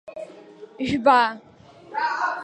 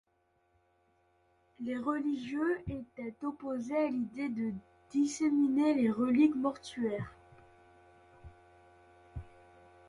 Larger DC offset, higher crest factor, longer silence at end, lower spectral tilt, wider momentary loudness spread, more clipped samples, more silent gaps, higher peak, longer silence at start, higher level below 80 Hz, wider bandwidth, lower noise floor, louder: neither; about the same, 20 dB vs 18 dB; second, 0 s vs 0.6 s; about the same, -5 dB/octave vs -6 dB/octave; first, 22 LU vs 16 LU; neither; neither; first, -4 dBFS vs -16 dBFS; second, 0.05 s vs 1.6 s; first, -56 dBFS vs -62 dBFS; second, 9.6 kHz vs 11 kHz; second, -44 dBFS vs -74 dBFS; first, -22 LUFS vs -33 LUFS